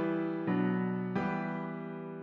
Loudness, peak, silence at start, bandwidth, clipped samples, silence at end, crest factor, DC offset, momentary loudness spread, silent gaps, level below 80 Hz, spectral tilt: -34 LUFS; -20 dBFS; 0 s; 5.4 kHz; under 0.1%; 0 s; 14 dB; under 0.1%; 9 LU; none; -70 dBFS; -9.5 dB/octave